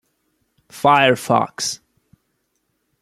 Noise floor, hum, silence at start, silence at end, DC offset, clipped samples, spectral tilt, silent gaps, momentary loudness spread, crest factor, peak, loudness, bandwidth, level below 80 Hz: -70 dBFS; none; 0.75 s; 1.25 s; under 0.1%; under 0.1%; -3.5 dB/octave; none; 11 LU; 20 dB; -2 dBFS; -17 LUFS; 15.5 kHz; -62 dBFS